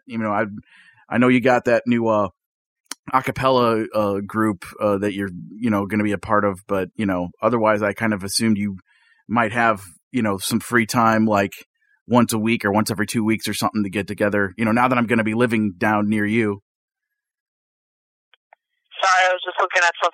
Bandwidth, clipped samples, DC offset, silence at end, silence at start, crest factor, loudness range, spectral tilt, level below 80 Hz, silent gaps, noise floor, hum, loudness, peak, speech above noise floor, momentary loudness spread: 16.5 kHz; under 0.1%; under 0.1%; 0.05 s; 0.1 s; 20 dB; 3 LU; -5 dB/octave; -56 dBFS; 2.46-2.84 s, 2.99-3.03 s, 10.03-10.11 s, 11.66-11.74 s, 12.01-12.06 s, 16.62-16.88 s, 17.40-18.51 s; -39 dBFS; none; -20 LUFS; -2 dBFS; 19 dB; 8 LU